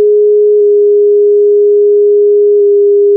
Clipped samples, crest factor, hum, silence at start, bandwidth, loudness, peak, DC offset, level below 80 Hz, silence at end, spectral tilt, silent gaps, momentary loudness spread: under 0.1%; 4 dB; none; 0 s; 0.5 kHz; -7 LUFS; -4 dBFS; under 0.1%; -88 dBFS; 0 s; -12.5 dB/octave; none; 0 LU